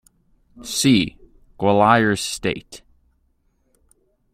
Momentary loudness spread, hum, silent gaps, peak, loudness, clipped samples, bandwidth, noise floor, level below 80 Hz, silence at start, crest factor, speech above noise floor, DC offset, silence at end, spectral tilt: 13 LU; none; none; -2 dBFS; -19 LUFS; under 0.1%; 16 kHz; -65 dBFS; -50 dBFS; 0.55 s; 20 dB; 46 dB; under 0.1%; 1.55 s; -4.5 dB/octave